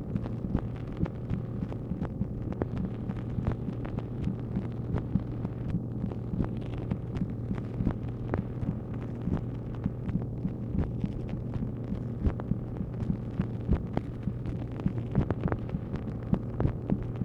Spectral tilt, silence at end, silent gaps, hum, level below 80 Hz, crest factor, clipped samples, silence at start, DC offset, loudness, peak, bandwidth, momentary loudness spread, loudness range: -10.5 dB/octave; 0 s; none; none; -40 dBFS; 22 dB; under 0.1%; 0 s; under 0.1%; -34 LUFS; -10 dBFS; 5.4 kHz; 4 LU; 2 LU